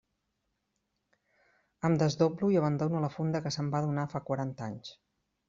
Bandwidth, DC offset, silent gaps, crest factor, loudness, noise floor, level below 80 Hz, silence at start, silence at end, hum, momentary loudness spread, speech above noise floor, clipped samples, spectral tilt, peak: 7.6 kHz; under 0.1%; none; 20 dB; -31 LUFS; -81 dBFS; -68 dBFS; 1.85 s; 0.55 s; none; 12 LU; 51 dB; under 0.1%; -7 dB/octave; -12 dBFS